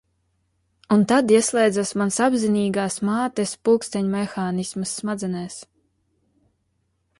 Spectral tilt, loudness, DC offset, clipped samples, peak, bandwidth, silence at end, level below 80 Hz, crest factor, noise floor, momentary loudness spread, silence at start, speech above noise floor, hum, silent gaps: -5 dB/octave; -21 LUFS; under 0.1%; under 0.1%; -4 dBFS; 11.5 kHz; 1.55 s; -62 dBFS; 18 dB; -70 dBFS; 10 LU; 0.9 s; 49 dB; none; none